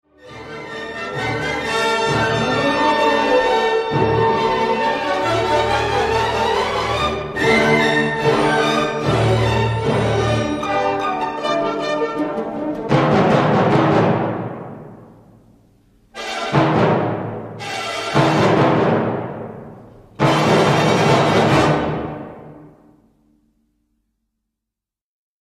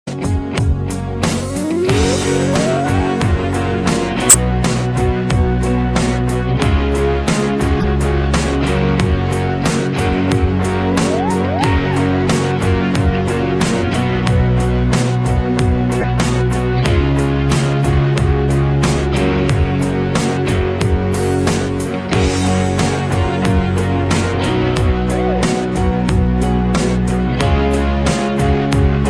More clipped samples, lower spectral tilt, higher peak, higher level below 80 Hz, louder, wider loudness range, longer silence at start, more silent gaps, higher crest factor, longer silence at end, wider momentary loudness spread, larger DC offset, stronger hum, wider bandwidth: neither; about the same, -5.5 dB/octave vs -5.5 dB/octave; about the same, -2 dBFS vs 0 dBFS; second, -42 dBFS vs -24 dBFS; about the same, -17 LUFS vs -16 LUFS; about the same, 4 LU vs 2 LU; first, 0.25 s vs 0.05 s; neither; about the same, 16 dB vs 14 dB; first, 2.75 s vs 0 s; first, 13 LU vs 2 LU; neither; neither; about the same, 14.5 kHz vs 14.5 kHz